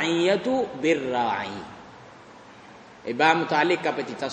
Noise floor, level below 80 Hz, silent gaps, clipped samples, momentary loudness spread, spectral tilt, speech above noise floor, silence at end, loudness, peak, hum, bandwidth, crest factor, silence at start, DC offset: -47 dBFS; -66 dBFS; none; under 0.1%; 18 LU; -4.5 dB/octave; 23 dB; 0 s; -24 LUFS; -4 dBFS; none; 9.4 kHz; 20 dB; 0 s; under 0.1%